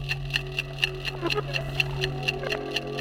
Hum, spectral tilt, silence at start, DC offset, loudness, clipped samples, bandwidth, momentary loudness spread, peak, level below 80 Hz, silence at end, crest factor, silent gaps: none; -4.5 dB/octave; 0 s; under 0.1%; -28 LUFS; under 0.1%; 17 kHz; 4 LU; -6 dBFS; -42 dBFS; 0 s; 24 dB; none